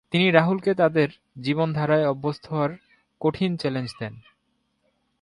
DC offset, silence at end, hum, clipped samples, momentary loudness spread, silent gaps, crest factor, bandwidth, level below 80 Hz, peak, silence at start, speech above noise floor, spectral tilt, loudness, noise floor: under 0.1%; 1 s; none; under 0.1%; 12 LU; none; 22 dB; 11 kHz; -60 dBFS; -2 dBFS; 0.1 s; 49 dB; -7.5 dB/octave; -23 LUFS; -72 dBFS